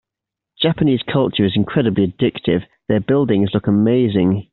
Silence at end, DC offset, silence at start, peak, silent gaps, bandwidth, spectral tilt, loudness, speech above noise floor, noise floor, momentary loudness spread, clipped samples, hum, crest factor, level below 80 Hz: 0.1 s; under 0.1%; 0.6 s; -2 dBFS; none; 4.3 kHz; -6 dB/octave; -17 LUFS; 69 dB; -85 dBFS; 5 LU; under 0.1%; none; 14 dB; -50 dBFS